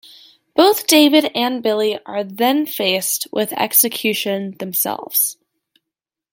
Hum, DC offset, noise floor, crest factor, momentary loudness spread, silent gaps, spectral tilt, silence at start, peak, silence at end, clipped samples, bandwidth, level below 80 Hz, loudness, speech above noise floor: none; under 0.1%; -84 dBFS; 18 dB; 10 LU; none; -2.5 dB/octave; 0.55 s; 0 dBFS; 1 s; under 0.1%; 17 kHz; -70 dBFS; -16 LUFS; 67 dB